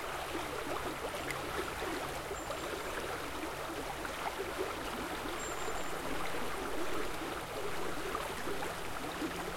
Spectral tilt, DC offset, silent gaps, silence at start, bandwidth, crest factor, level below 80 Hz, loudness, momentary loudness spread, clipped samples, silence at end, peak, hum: -3.5 dB/octave; under 0.1%; none; 0 s; 16.5 kHz; 16 dB; -54 dBFS; -39 LUFS; 2 LU; under 0.1%; 0 s; -22 dBFS; none